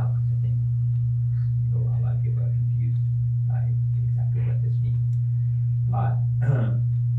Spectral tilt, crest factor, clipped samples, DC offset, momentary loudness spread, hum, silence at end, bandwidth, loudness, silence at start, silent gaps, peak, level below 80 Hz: -11.5 dB/octave; 12 dB; under 0.1%; under 0.1%; 1 LU; none; 0 s; 2 kHz; -24 LUFS; 0 s; none; -10 dBFS; -44 dBFS